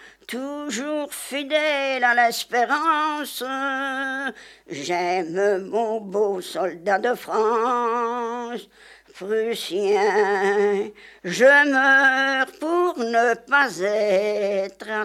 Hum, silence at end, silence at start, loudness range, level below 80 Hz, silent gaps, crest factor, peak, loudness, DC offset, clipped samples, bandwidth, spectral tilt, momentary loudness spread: none; 0 s; 0 s; 6 LU; -70 dBFS; none; 18 dB; -4 dBFS; -21 LUFS; under 0.1%; under 0.1%; 15.5 kHz; -3 dB/octave; 13 LU